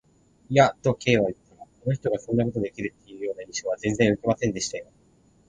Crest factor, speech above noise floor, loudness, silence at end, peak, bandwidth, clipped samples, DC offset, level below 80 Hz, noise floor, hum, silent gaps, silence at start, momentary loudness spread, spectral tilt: 22 dB; 36 dB; -25 LUFS; 0.65 s; -4 dBFS; 9.6 kHz; under 0.1%; under 0.1%; -54 dBFS; -60 dBFS; none; none; 0.5 s; 14 LU; -5.5 dB/octave